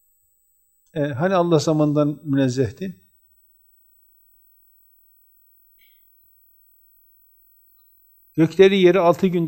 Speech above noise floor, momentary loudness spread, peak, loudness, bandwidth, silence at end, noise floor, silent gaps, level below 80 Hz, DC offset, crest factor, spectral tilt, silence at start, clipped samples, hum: 46 dB; 15 LU; -2 dBFS; -18 LUFS; 16 kHz; 0 s; -63 dBFS; none; -64 dBFS; under 0.1%; 20 dB; -7 dB/octave; 0.95 s; under 0.1%; none